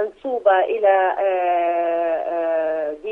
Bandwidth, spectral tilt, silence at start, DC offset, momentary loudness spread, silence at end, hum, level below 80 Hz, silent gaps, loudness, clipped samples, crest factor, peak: 3.9 kHz; -5.5 dB/octave; 0 s; under 0.1%; 6 LU; 0 s; none; -60 dBFS; none; -20 LUFS; under 0.1%; 16 dB; -4 dBFS